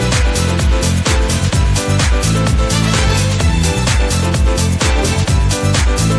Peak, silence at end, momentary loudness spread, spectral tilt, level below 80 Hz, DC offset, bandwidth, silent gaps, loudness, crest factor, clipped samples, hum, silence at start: -2 dBFS; 0 s; 1 LU; -4.5 dB/octave; -16 dBFS; under 0.1%; 11 kHz; none; -14 LUFS; 12 dB; under 0.1%; none; 0 s